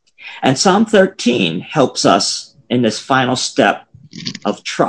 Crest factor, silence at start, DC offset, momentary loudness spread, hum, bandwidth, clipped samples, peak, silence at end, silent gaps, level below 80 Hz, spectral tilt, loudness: 16 dB; 0.2 s; under 0.1%; 11 LU; none; 10.5 kHz; 0.2%; 0 dBFS; 0 s; none; -56 dBFS; -4 dB/octave; -15 LUFS